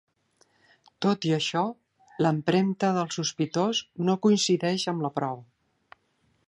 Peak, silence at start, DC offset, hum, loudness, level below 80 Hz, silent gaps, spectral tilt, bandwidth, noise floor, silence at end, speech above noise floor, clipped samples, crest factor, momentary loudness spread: -8 dBFS; 1 s; under 0.1%; none; -26 LUFS; -72 dBFS; none; -5 dB/octave; 11 kHz; -70 dBFS; 1.05 s; 44 dB; under 0.1%; 18 dB; 8 LU